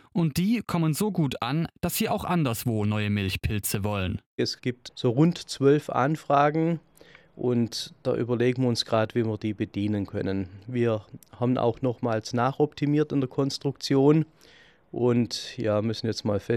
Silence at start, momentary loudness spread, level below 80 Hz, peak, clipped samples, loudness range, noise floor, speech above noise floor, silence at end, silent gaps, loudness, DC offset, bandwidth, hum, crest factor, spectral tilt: 0.15 s; 8 LU; -54 dBFS; -8 dBFS; under 0.1%; 2 LU; -53 dBFS; 28 dB; 0 s; 4.26-4.38 s; -26 LUFS; under 0.1%; 16.5 kHz; none; 18 dB; -6 dB/octave